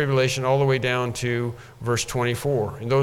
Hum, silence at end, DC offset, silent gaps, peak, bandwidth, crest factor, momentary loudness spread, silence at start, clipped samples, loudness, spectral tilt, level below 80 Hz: none; 0 s; under 0.1%; none; -8 dBFS; 16 kHz; 14 dB; 6 LU; 0 s; under 0.1%; -23 LUFS; -5 dB/octave; -50 dBFS